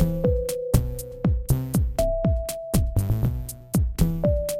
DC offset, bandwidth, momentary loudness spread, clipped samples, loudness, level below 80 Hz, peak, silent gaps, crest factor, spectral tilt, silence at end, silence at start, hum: under 0.1%; 17 kHz; 4 LU; under 0.1%; -25 LUFS; -28 dBFS; -6 dBFS; none; 18 dB; -7 dB/octave; 0 s; 0 s; none